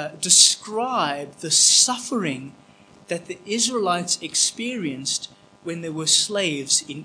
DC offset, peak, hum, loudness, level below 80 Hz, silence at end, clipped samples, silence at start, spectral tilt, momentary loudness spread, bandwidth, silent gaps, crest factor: under 0.1%; 0 dBFS; none; -19 LUFS; -72 dBFS; 0 s; under 0.1%; 0 s; -1 dB/octave; 18 LU; 10.5 kHz; none; 22 dB